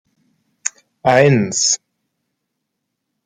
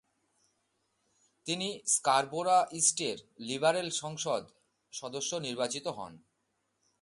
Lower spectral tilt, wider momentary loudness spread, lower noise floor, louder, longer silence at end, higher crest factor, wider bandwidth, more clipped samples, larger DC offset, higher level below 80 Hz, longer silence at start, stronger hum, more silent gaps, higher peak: first, -3.5 dB/octave vs -2 dB/octave; about the same, 14 LU vs 15 LU; about the same, -76 dBFS vs -79 dBFS; first, -16 LUFS vs -31 LUFS; first, 1.5 s vs 0.85 s; about the same, 18 dB vs 22 dB; second, 10 kHz vs 11.5 kHz; neither; neither; first, -60 dBFS vs -78 dBFS; second, 0.65 s vs 1.45 s; neither; neither; first, 0 dBFS vs -12 dBFS